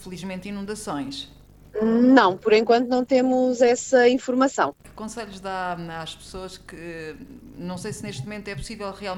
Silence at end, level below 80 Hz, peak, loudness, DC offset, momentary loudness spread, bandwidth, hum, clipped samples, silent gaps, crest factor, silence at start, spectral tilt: 0 s; -52 dBFS; -2 dBFS; -22 LUFS; under 0.1%; 19 LU; 12.5 kHz; none; under 0.1%; none; 20 dB; 0 s; -5 dB/octave